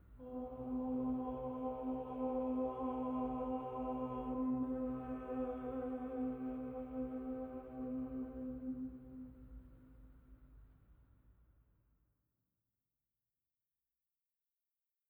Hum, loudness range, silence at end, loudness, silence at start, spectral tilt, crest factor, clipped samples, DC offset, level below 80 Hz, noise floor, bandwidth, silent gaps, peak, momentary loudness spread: none; 11 LU; 3.75 s; -42 LUFS; 0.05 s; -10.5 dB/octave; 14 dB; under 0.1%; under 0.1%; -62 dBFS; under -90 dBFS; 3.5 kHz; none; -30 dBFS; 11 LU